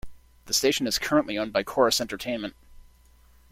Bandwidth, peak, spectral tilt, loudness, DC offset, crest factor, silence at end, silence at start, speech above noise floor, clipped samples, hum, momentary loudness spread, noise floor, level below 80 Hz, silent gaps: 16.5 kHz; -6 dBFS; -2.5 dB/octave; -25 LUFS; under 0.1%; 22 dB; 0.7 s; 0.05 s; 31 dB; under 0.1%; none; 9 LU; -56 dBFS; -52 dBFS; none